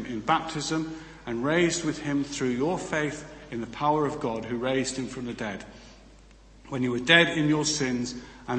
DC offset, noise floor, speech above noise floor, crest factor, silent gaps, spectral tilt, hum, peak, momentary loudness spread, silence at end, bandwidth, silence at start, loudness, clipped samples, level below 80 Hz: under 0.1%; -52 dBFS; 25 dB; 26 dB; none; -4 dB/octave; none; -2 dBFS; 15 LU; 0 s; 8.8 kHz; 0 s; -27 LUFS; under 0.1%; -54 dBFS